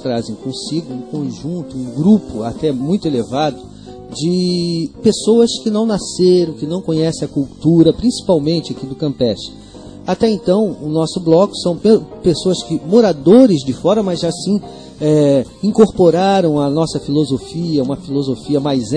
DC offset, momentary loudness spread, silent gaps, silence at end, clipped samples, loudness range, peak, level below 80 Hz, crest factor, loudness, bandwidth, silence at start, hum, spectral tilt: 0.1%; 12 LU; none; 0 s; under 0.1%; 5 LU; 0 dBFS; -44 dBFS; 14 dB; -15 LUFS; 10 kHz; 0 s; none; -6.5 dB/octave